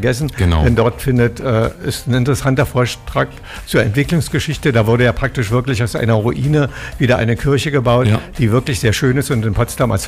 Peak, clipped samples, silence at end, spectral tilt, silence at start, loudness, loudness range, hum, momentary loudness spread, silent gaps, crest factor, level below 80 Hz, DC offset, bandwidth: -4 dBFS; under 0.1%; 0 s; -6 dB/octave; 0 s; -16 LUFS; 1 LU; none; 5 LU; none; 10 dB; -30 dBFS; under 0.1%; 16 kHz